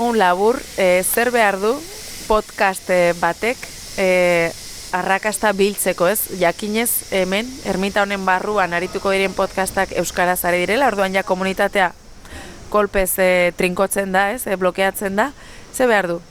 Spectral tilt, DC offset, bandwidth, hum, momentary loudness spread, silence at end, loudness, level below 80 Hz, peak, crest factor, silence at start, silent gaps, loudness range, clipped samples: -3.5 dB/octave; under 0.1%; over 20 kHz; none; 7 LU; 0.1 s; -18 LUFS; -42 dBFS; -4 dBFS; 16 dB; 0 s; none; 1 LU; under 0.1%